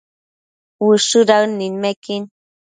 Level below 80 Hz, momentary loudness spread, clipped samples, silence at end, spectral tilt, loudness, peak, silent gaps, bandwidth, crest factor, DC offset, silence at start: -68 dBFS; 14 LU; under 0.1%; 0.4 s; -3.5 dB/octave; -16 LUFS; 0 dBFS; 1.96-2.02 s; 9.6 kHz; 18 dB; under 0.1%; 0.8 s